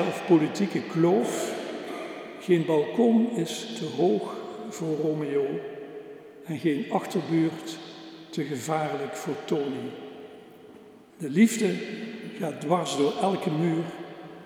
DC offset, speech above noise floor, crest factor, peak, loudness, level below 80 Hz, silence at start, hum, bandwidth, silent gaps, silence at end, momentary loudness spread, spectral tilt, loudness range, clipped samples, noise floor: under 0.1%; 24 dB; 18 dB; -8 dBFS; -27 LUFS; -80 dBFS; 0 s; none; 16 kHz; none; 0 s; 17 LU; -6 dB/octave; 5 LU; under 0.1%; -50 dBFS